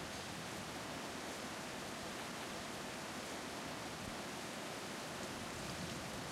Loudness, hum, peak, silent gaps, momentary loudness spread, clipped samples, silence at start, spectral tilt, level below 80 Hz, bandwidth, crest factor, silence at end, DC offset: -45 LUFS; none; -32 dBFS; none; 1 LU; under 0.1%; 0 s; -3 dB/octave; -68 dBFS; 16 kHz; 14 dB; 0 s; under 0.1%